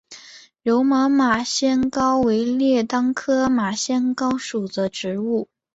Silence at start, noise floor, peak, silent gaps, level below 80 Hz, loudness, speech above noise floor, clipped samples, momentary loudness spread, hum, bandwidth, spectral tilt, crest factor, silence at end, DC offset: 0.1 s; -45 dBFS; -6 dBFS; none; -56 dBFS; -20 LUFS; 25 dB; under 0.1%; 8 LU; none; 8 kHz; -4 dB/octave; 14 dB; 0.3 s; under 0.1%